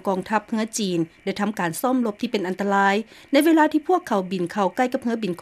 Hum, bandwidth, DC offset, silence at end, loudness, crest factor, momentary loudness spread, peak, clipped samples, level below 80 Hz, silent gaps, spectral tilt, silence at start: none; 15.5 kHz; under 0.1%; 0.05 s; -22 LUFS; 16 dB; 8 LU; -6 dBFS; under 0.1%; -64 dBFS; none; -5 dB/octave; 0.05 s